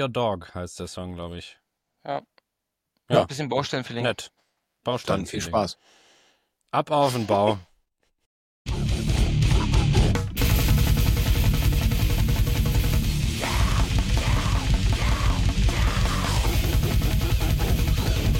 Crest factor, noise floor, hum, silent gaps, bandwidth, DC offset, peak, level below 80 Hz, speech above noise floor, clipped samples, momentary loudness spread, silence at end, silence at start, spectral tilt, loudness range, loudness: 18 dB; -82 dBFS; none; 8.26-8.65 s; 17 kHz; under 0.1%; -6 dBFS; -26 dBFS; 56 dB; under 0.1%; 12 LU; 0 s; 0 s; -5.5 dB/octave; 6 LU; -24 LUFS